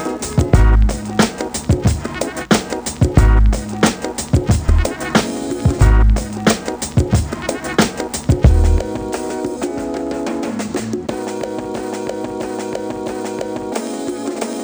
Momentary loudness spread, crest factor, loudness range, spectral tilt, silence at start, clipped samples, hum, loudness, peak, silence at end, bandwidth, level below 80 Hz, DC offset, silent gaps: 11 LU; 16 dB; 7 LU; -5.5 dB/octave; 0 s; under 0.1%; none; -18 LUFS; 0 dBFS; 0 s; over 20 kHz; -20 dBFS; under 0.1%; none